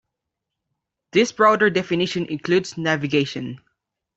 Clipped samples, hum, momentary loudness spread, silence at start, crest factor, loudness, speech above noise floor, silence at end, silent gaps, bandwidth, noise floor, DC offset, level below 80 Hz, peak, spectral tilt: under 0.1%; none; 10 LU; 1.15 s; 20 dB; -20 LUFS; 62 dB; 0.6 s; none; 8 kHz; -82 dBFS; under 0.1%; -62 dBFS; -2 dBFS; -5 dB/octave